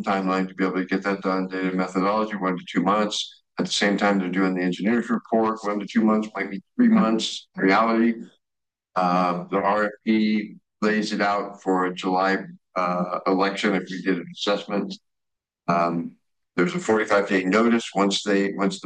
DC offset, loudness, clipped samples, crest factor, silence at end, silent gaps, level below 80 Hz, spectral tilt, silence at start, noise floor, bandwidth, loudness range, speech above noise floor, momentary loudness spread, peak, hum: under 0.1%; -23 LUFS; under 0.1%; 16 dB; 0.05 s; none; -70 dBFS; -5.5 dB/octave; 0 s; -86 dBFS; 9.6 kHz; 3 LU; 63 dB; 9 LU; -6 dBFS; none